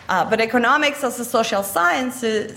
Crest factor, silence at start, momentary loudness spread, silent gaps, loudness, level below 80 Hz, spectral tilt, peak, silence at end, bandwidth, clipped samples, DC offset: 14 dB; 0 s; 6 LU; none; -19 LUFS; -58 dBFS; -3 dB/octave; -6 dBFS; 0 s; 16.5 kHz; under 0.1%; under 0.1%